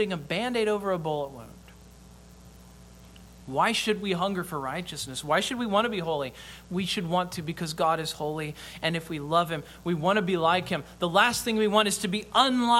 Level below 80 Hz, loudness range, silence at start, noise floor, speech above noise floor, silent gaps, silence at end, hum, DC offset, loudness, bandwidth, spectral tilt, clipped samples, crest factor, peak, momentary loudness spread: -56 dBFS; 7 LU; 0 s; -50 dBFS; 23 dB; none; 0 s; none; under 0.1%; -27 LUFS; 17 kHz; -4 dB/octave; under 0.1%; 22 dB; -6 dBFS; 11 LU